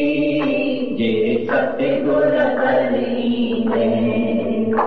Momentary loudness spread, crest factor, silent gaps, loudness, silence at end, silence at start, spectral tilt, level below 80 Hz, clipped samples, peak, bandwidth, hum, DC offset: 3 LU; 10 dB; none; -18 LUFS; 0 s; 0 s; -8.5 dB/octave; -48 dBFS; under 0.1%; -6 dBFS; 4.9 kHz; none; 2%